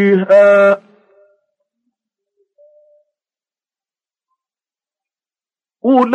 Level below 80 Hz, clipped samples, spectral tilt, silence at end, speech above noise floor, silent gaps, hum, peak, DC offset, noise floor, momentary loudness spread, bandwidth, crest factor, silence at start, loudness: -76 dBFS; under 0.1%; -8 dB/octave; 0 s; over 81 dB; none; none; -2 dBFS; under 0.1%; under -90 dBFS; 12 LU; 7.8 kHz; 14 dB; 0 s; -11 LUFS